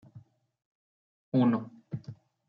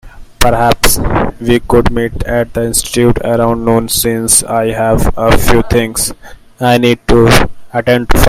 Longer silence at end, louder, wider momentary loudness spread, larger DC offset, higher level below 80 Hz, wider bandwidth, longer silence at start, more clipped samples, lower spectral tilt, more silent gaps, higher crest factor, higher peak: first, 0.35 s vs 0 s; second, -28 LUFS vs -11 LUFS; first, 16 LU vs 6 LU; neither; second, -74 dBFS vs -20 dBFS; second, 5.2 kHz vs over 20 kHz; about the same, 0.15 s vs 0.05 s; second, under 0.1% vs 0.3%; first, -10.5 dB/octave vs -4 dB/octave; first, 0.65-1.32 s vs none; first, 18 dB vs 10 dB; second, -16 dBFS vs 0 dBFS